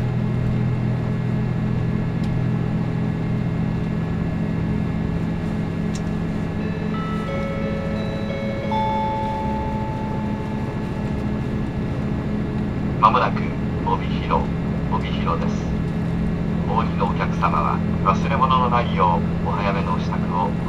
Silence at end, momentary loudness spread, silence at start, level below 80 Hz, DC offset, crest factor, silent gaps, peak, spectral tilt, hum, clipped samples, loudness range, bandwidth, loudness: 0 s; 6 LU; 0 s; -34 dBFS; under 0.1%; 22 dB; none; 0 dBFS; -8 dB/octave; none; under 0.1%; 5 LU; 7.8 kHz; -22 LUFS